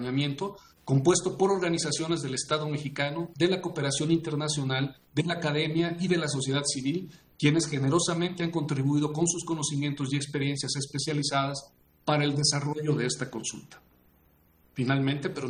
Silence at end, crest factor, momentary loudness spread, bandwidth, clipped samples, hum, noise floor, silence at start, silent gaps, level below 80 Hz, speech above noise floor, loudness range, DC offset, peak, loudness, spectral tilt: 0 s; 20 dB; 7 LU; 11 kHz; under 0.1%; none; -63 dBFS; 0 s; none; -64 dBFS; 35 dB; 2 LU; under 0.1%; -8 dBFS; -28 LUFS; -4.5 dB/octave